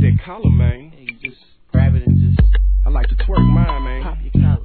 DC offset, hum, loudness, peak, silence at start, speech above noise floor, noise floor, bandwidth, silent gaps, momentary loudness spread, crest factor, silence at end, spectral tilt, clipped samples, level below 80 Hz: 0.3%; none; -16 LUFS; 0 dBFS; 0 s; 20 dB; -34 dBFS; 4.5 kHz; none; 14 LU; 14 dB; 0 s; -12 dB/octave; under 0.1%; -18 dBFS